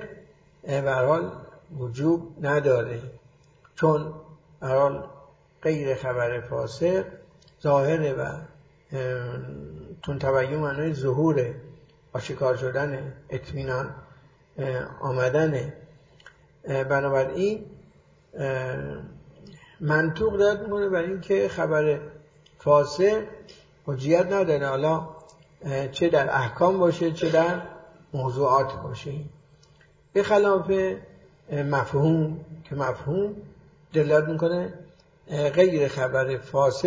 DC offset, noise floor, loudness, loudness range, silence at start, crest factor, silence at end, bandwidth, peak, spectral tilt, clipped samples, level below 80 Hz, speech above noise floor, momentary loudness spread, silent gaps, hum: under 0.1%; -57 dBFS; -25 LUFS; 5 LU; 0 s; 20 dB; 0 s; 7.8 kHz; -6 dBFS; -7 dB/octave; under 0.1%; -54 dBFS; 33 dB; 16 LU; none; none